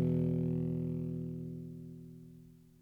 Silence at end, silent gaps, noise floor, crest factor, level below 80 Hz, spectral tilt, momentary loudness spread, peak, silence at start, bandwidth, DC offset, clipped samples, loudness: 0.2 s; none; -57 dBFS; 14 dB; -60 dBFS; -11.5 dB/octave; 21 LU; -22 dBFS; 0 s; 3.3 kHz; under 0.1%; under 0.1%; -37 LUFS